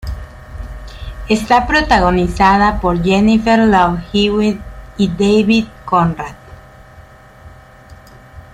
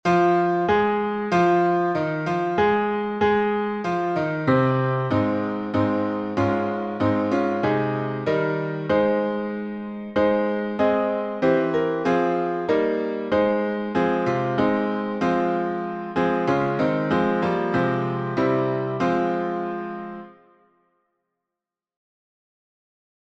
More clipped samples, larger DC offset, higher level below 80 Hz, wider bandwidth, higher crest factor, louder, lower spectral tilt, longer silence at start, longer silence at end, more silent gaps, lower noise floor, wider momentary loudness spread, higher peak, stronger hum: neither; neither; first, -30 dBFS vs -56 dBFS; first, 12 kHz vs 8 kHz; about the same, 14 dB vs 16 dB; first, -13 LUFS vs -23 LUFS; second, -6 dB/octave vs -8 dB/octave; about the same, 0.05 s vs 0.05 s; second, 0.15 s vs 2.95 s; neither; second, -40 dBFS vs -88 dBFS; first, 20 LU vs 6 LU; first, 0 dBFS vs -8 dBFS; neither